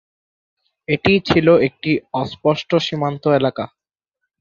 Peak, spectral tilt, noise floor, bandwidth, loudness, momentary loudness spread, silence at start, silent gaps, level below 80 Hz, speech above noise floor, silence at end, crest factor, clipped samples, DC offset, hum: -2 dBFS; -7 dB/octave; -79 dBFS; 7.4 kHz; -17 LUFS; 11 LU; 0.9 s; none; -48 dBFS; 62 dB; 0.75 s; 18 dB; under 0.1%; under 0.1%; none